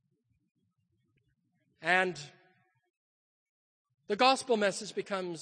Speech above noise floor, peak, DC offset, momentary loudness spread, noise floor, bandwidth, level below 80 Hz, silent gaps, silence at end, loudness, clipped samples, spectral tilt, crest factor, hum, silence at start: 47 dB; -12 dBFS; under 0.1%; 12 LU; -77 dBFS; 9.8 kHz; -84 dBFS; 2.90-3.85 s; 0 s; -30 LUFS; under 0.1%; -3 dB/octave; 24 dB; none; 1.8 s